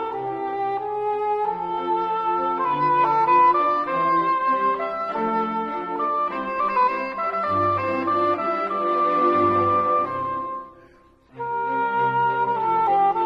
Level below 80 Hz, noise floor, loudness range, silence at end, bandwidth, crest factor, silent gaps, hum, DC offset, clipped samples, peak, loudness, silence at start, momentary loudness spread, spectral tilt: -60 dBFS; -53 dBFS; 3 LU; 0 s; 6.4 kHz; 14 dB; none; none; under 0.1%; under 0.1%; -8 dBFS; -22 LUFS; 0 s; 8 LU; -7.5 dB/octave